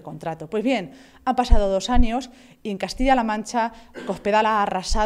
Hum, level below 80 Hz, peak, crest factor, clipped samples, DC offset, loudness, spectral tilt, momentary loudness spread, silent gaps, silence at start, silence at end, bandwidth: none; -26 dBFS; 0 dBFS; 20 dB; under 0.1%; under 0.1%; -23 LUFS; -5 dB/octave; 12 LU; none; 0.05 s; 0 s; 11.5 kHz